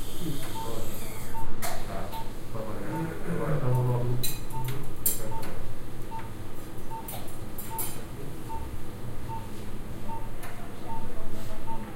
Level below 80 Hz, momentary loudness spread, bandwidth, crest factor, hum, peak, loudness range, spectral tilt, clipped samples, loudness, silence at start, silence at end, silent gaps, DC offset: -36 dBFS; 12 LU; 16 kHz; 14 dB; none; -10 dBFS; 9 LU; -5 dB/octave; under 0.1%; -35 LUFS; 0 s; 0 s; none; under 0.1%